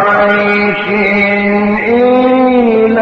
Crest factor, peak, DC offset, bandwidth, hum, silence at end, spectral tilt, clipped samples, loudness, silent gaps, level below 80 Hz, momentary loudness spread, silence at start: 8 dB; 0 dBFS; under 0.1%; 6.2 kHz; none; 0 s; -8 dB/octave; under 0.1%; -9 LUFS; none; -42 dBFS; 3 LU; 0 s